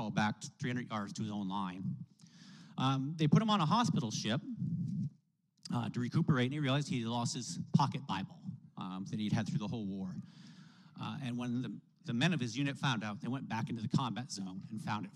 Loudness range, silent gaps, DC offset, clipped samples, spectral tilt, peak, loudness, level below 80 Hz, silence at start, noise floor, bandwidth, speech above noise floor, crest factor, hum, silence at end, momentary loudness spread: 6 LU; none; under 0.1%; under 0.1%; -5.5 dB/octave; -16 dBFS; -36 LUFS; -76 dBFS; 0 s; -72 dBFS; 11.5 kHz; 37 dB; 22 dB; none; 0.05 s; 15 LU